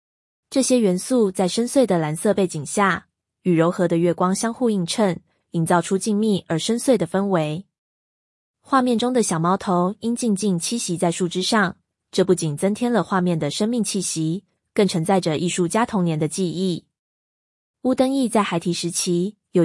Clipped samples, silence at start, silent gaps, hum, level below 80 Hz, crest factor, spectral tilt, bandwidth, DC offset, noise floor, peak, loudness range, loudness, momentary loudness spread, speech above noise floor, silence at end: under 0.1%; 0.5 s; 7.78-8.54 s, 16.99-17.74 s; none; -64 dBFS; 16 dB; -5 dB/octave; 12 kHz; under 0.1%; under -90 dBFS; -6 dBFS; 2 LU; -21 LUFS; 5 LU; over 70 dB; 0 s